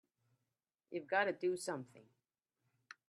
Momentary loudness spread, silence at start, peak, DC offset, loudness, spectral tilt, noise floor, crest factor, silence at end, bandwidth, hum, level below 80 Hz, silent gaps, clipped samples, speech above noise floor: 13 LU; 0.9 s; -20 dBFS; under 0.1%; -39 LUFS; -4 dB/octave; under -90 dBFS; 24 dB; 1.05 s; 13 kHz; none; under -90 dBFS; none; under 0.1%; over 51 dB